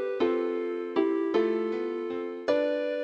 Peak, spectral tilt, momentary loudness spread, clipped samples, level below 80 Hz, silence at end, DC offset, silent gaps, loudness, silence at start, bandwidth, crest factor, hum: -12 dBFS; -6 dB/octave; 6 LU; under 0.1%; -76 dBFS; 0 s; under 0.1%; none; -29 LUFS; 0 s; 6.8 kHz; 16 dB; none